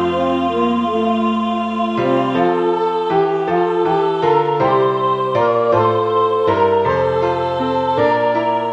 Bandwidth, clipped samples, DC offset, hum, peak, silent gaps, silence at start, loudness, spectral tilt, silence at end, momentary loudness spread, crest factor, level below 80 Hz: 8 kHz; under 0.1%; under 0.1%; none; -2 dBFS; none; 0 s; -16 LUFS; -7.5 dB/octave; 0 s; 3 LU; 14 dB; -52 dBFS